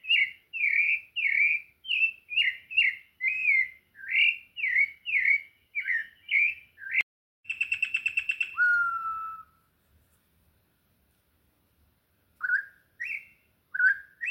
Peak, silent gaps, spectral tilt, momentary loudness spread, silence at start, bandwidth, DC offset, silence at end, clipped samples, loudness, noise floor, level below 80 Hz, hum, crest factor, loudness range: -14 dBFS; 7.03-7.43 s; 1.5 dB/octave; 12 LU; 0.05 s; 16.5 kHz; under 0.1%; 0 s; under 0.1%; -26 LUFS; -69 dBFS; -74 dBFS; none; 16 dB; 12 LU